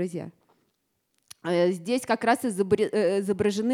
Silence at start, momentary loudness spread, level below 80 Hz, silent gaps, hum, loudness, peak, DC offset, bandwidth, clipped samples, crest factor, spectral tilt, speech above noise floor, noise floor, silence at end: 0 s; 11 LU; -66 dBFS; none; none; -25 LUFS; -8 dBFS; under 0.1%; 15.5 kHz; under 0.1%; 18 dB; -5.5 dB/octave; 50 dB; -75 dBFS; 0 s